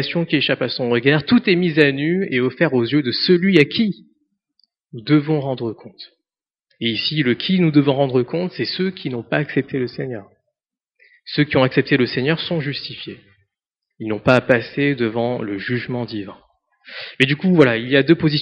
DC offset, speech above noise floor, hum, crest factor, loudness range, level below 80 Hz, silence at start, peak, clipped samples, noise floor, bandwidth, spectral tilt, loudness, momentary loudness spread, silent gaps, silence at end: under 0.1%; 67 dB; none; 20 dB; 6 LU; -58 dBFS; 0 s; 0 dBFS; under 0.1%; -85 dBFS; 6 kHz; -4.5 dB/octave; -18 LUFS; 15 LU; none; 0 s